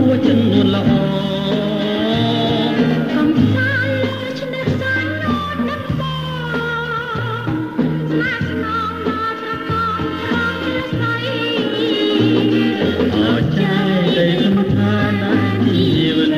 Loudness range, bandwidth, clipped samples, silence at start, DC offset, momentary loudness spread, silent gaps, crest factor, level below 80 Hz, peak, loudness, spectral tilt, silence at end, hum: 5 LU; 15 kHz; under 0.1%; 0 s; under 0.1%; 7 LU; none; 14 dB; -42 dBFS; -2 dBFS; -17 LUFS; -7 dB/octave; 0 s; none